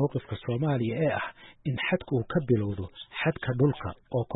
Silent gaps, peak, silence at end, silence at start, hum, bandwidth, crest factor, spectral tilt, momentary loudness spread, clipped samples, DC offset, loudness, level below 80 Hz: none; -12 dBFS; 0 s; 0 s; none; 4 kHz; 16 dB; -11.5 dB/octave; 11 LU; under 0.1%; under 0.1%; -29 LUFS; -56 dBFS